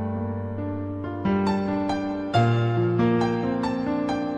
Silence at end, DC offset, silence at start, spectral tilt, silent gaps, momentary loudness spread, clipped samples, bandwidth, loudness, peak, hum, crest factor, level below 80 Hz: 0 s; under 0.1%; 0 s; -8 dB/octave; none; 9 LU; under 0.1%; 9.4 kHz; -25 LUFS; -8 dBFS; none; 16 dB; -52 dBFS